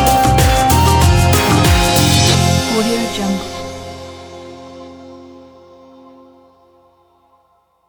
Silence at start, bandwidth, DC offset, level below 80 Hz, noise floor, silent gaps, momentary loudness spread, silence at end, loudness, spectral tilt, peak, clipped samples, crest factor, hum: 0 s; over 20 kHz; under 0.1%; -24 dBFS; -57 dBFS; none; 23 LU; 2.55 s; -12 LUFS; -4.5 dB/octave; 0 dBFS; under 0.1%; 14 dB; none